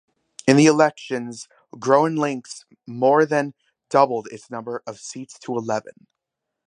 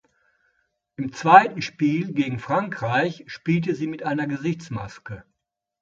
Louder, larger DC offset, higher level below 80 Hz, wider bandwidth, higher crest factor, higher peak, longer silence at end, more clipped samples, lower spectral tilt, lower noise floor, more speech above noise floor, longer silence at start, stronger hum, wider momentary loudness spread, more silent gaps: about the same, -20 LUFS vs -22 LUFS; neither; second, -70 dBFS vs -60 dBFS; first, 10.5 kHz vs 7.6 kHz; about the same, 22 dB vs 24 dB; about the same, 0 dBFS vs 0 dBFS; first, 0.8 s vs 0.6 s; neither; about the same, -5.5 dB/octave vs -6.5 dB/octave; about the same, -82 dBFS vs -82 dBFS; about the same, 62 dB vs 60 dB; second, 0.45 s vs 1 s; neither; about the same, 19 LU vs 19 LU; neither